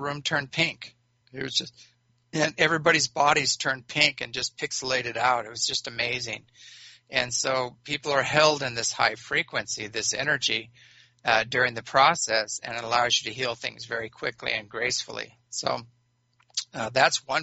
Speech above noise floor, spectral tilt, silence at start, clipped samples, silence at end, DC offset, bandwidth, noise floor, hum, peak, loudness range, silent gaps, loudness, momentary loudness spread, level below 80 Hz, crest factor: 41 dB; -1 dB/octave; 0 s; under 0.1%; 0 s; under 0.1%; 8 kHz; -67 dBFS; none; -4 dBFS; 4 LU; none; -25 LUFS; 12 LU; -64 dBFS; 22 dB